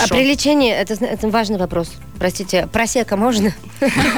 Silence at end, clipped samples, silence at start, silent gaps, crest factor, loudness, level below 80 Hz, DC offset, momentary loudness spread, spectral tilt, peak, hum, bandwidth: 0 s; under 0.1%; 0 s; none; 12 dB; -17 LUFS; -38 dBFS; 1%; 8 LU; -4 dB/octave; -4 dBFS; none; over 20 kHz